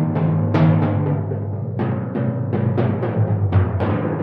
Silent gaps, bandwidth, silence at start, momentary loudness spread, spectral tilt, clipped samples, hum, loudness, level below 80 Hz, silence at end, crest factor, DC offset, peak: none; 4.9 kHz; 0 s; 7 LU; -11 dB/octave; under 0.1%; none; -20 LUFS; -54 dBFS; 0 s; 14 dB; under 0.1%; -4 dBFS